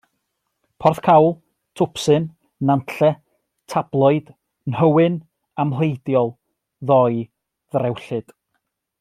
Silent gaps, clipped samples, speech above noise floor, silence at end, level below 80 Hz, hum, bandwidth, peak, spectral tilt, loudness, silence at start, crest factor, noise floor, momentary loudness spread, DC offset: none; under 0.1%; 57 dB; 0.8 s; -60 dBFS; none; 14.5 kHz; -2 dBFS; -7.5 dB/octave; -19 LUFS; 0.8 s; 18 dB; -75 dBFS; 15 LU; under 0.1%